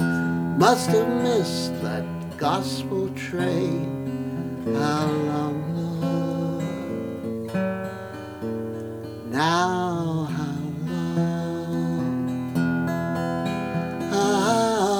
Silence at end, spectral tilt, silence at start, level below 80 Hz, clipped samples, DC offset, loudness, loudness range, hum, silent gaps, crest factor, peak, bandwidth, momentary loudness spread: 0 s; -6 dB/octave; 0 s; -58 dBFS; under 0.1%; under 0.1%; -25 LUFS; 5 LU; none; none; 20 dB; -4 dBFS; 20 kHz; 10 LU